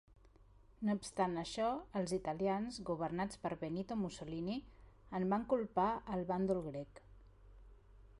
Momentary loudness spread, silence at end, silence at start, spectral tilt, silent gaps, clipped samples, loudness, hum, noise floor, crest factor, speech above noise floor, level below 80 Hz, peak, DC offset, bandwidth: 7 LU; 0 s; 0.1 s; -6 dB/octave; none; under 0.1%; -39 LUFS; none; -64 dBFS; 18 dB; 26 dB; -62 dBFS; -22 dBFS; under 0.1%; 11.5 kHz